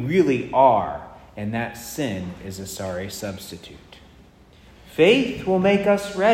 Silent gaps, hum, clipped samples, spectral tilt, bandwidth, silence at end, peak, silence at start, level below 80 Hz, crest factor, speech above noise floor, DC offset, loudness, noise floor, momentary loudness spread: none; none; under 0.1%; -5.5 dB/octave; 16 kHz; 0 s; -2 dBFS; 0 s; -52 dBFS; 20 dB; 29 dB; under 0.1%; -21 LUFS; -50 dBFS; 19 LU